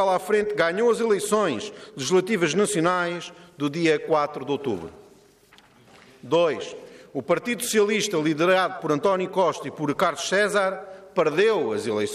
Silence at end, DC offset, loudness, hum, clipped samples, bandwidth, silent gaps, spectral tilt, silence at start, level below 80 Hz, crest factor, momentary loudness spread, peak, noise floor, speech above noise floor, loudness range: 0 s; under 0.1%; -23 LUFS; none; under 0.1%; 15 kHz; none; -4 dB/octave; 0 s; -66 dBFS; 14 dB; 11 LU; -10 dBFS; -55 dBFS; 32 dB; 5 LU